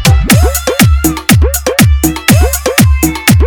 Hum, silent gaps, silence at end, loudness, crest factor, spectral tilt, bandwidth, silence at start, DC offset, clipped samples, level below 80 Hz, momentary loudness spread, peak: none; none; 0 s; -9 LUFS; 8 dB; -4.5 dB/octave; over 20 kHz; 0 s; under 0.1%; 0.7%; -14 dBFS; 3 LU; 0 dBFS